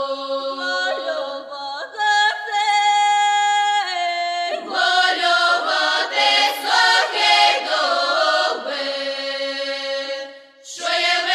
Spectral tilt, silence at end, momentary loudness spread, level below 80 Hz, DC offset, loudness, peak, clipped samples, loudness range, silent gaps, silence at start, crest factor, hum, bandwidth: 1.5 dB/octave; 0 s; 11 LU; -78 dBFS; under 0.1%; -18 LUFS; -2 dBFS; under 0.1%; 5 LU; none; 0 s; 16 dB; none; 15 kHz